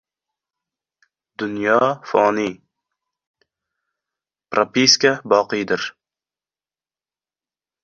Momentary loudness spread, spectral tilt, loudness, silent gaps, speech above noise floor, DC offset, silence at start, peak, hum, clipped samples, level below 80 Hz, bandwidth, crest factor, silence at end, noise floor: 14 LU; -3 dB/octave; -18 LUFS; 3.27-3.34 s; over 72 dB; under 0.1%; 1.4 s; 0 dBFS; none; under 0.1%; -64 dBFS; 7.4 kHz; 22 dB; 1.95 s; under -90 dBFS